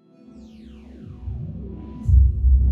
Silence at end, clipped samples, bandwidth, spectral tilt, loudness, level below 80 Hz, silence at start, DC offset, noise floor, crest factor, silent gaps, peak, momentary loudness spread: 0 s; under 0.1%; 1.1 kHz; -11 dB/octave; -21 LUFS; -22 dBFS; 1 s; under 0.1%; -45 dBFS; 16 dB; none; -4 dBFS; 25 LU